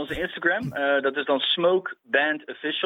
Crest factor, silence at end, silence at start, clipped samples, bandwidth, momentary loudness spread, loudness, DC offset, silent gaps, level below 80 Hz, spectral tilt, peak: 18 dB; 0 s; 0 s; under 0.1%; 13 kHz; 7 LU; -24 LUFS; under 0.1%; none; -56 dBFS; -5.5 dB/octave; -6 dBFS